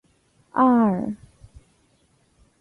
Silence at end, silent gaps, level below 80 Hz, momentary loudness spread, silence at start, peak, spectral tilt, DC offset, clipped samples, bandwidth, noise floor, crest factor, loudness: 1.45 s; none; -56 dBFS; 16 LU; 0.55 s; -6 dBFS; -9.5 dB/octave; under 0.1%; under 0.1%; 4.1 kHz; -63 dBFS; 18 dB; -21 LUFS